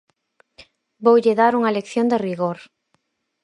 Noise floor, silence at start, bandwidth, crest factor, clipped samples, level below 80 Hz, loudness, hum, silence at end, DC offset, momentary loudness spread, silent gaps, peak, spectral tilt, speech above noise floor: -69 dBFS; 1 s; 10.5 kHz; 18 dB; under 0.1%; -68 dBFS; -19 LUFS; none; 0.8 s; under 0.1%; 10 LU; none; -2 dBFS; -6.5 dB/octave; 51 dB